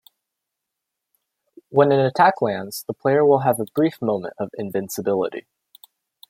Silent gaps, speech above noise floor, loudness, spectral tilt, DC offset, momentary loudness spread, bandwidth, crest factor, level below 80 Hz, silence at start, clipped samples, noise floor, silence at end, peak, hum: none; 63 dB; -20 LUFS; -6 dB/octave; under 0.1%; 12 LU; 16.5 kHz; 20 dB; -68 dBFS; 1.7 s; under 0.1%; -82 dBFS; 0.9 s; -2 dBFS; none